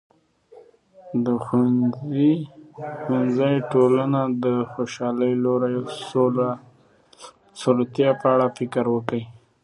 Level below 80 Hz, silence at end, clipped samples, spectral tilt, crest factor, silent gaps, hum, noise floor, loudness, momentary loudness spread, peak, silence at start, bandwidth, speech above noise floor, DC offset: -66 dBFS; 0.25 s; under 0.1%; -7.5 dB/octave; 18 dB; none; none; -55 dBFS; -22 LUFS; 10 LU; -4 dBFS; 0.55 s; 11 kHz; 34 dB; under 0.1%